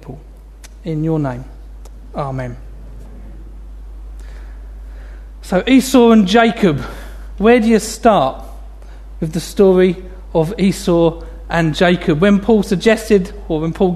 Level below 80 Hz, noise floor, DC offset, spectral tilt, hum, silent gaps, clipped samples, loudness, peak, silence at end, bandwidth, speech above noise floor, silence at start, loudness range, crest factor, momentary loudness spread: -32 dBFS; -36 dBFS; under 0.1%; -6 dB/octave; none; none; under 0.1%; -14 LUFS; 0 dBFS; 0 s; 13.5 kHz; 23 dB; 0.05 s; 17 LU; 16 dB; 24 LU